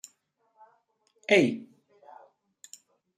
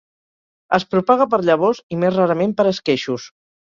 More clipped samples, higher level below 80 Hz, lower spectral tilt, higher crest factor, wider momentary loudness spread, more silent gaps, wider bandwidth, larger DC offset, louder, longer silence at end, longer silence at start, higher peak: neither; second, -78 dBFS vs -60 dBFS; second, -4.5 dB/octave vs -6.5 dB/octave; first, 24 dB vs 16 dB; first, 27 LU vs 5 LU; second, none vs 1.83-1.90 s; first, 14.5 kHz vs 7.4 kHz; neither; second, -24 LUFS vs -18 LUFS; first, 1.55 s vs 0.4 s; first, 1.3 s vs 0.7 s; second, -8 dBFS vs -2 dBFS